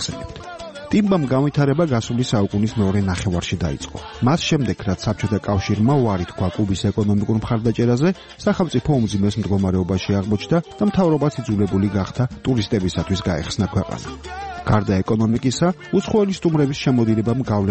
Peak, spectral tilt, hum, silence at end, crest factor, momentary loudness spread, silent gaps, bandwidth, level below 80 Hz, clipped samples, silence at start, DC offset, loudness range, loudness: -2 dBFS; -6.5 dB/octave; none; 0 s; 16 dB; 6 LU; none; 8.8 kHz; -40 dBFS; under 0.1%; 0 s; 0.2%; 2 LU; -20 LUFS